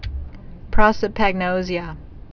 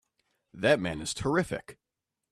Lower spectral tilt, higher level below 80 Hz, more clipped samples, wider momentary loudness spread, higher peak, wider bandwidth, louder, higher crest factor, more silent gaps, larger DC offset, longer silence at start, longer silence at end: first, -6.5 dB/octave vs -4.5 dB/octave; first, -28 dBFS vs -56 dBFS; neither; first, 21 LU vs 9 LU; first, 0 dBFS vs -10 dBFS; second, 5.4 kHz vs 14.5 kHz; first, -20 LUFS vs -29 LUFS; about the same, 20 dB vs 22 dB; neither; neither; second, 0 s vs 0.55 s; second, 0.15 s vs 0.6 s